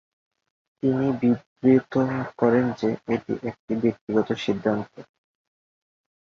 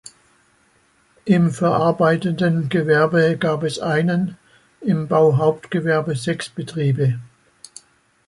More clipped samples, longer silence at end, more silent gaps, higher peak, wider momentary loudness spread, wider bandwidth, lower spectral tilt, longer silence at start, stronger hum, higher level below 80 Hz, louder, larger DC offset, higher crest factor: neither; first, 1.35 s vs 1 s; first, 1.46-1.56 s, 3.59-3.68 s, 4.01-4.07 s vs none; about the same, -6 dBFS vs -4 dBFS; about the same, 9 LU vs 9 LU; second, 6.8 kHz vs 11.5 kHz; about the same, -8 dB/octave vs -7 dB/octave; second, 0.85 s vs 1.25 s; neither; about the same, -60 dBFS vs -58 dBFS; second, -24 LUFS vs -19 LUFS; neither; about the same, 18 dB vs 16 dB